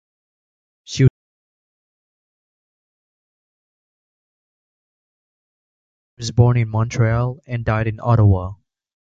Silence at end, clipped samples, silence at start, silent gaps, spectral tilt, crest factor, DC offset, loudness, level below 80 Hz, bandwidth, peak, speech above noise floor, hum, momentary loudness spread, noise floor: 0.55 s; under 0.1%; 0.9 s; 1.10-6.17 s; -7 dB/octave; 20 dB; under 0.1%; -18 LUFS; -40 dBFS; 7.8 kHz; -2 dBFS; over 73 dB; none; 10 LU; under -90 dBFS